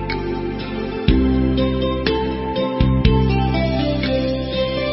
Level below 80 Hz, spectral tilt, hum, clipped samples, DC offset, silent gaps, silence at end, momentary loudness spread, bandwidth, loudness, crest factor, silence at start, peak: -24 dBFS; -11 dB/octave; none; under 0.1%; under 0.1%; none; 0 s; 8 LU; 5.8 kHz; -19 LUFS; 18 dB; 0 s; -2 dBFS